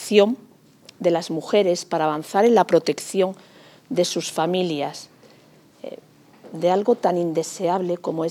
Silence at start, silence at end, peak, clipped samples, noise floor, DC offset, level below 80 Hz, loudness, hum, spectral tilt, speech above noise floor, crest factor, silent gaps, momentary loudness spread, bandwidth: 0 s; 0 s; -2 dBFS; under 0.1%; -52 dBFS; under 0.1%; -80 dBFS; -21 LUFS; none; -5 dB/octave; 32 dB; 20 dB; none; 17 LU; 18 kHz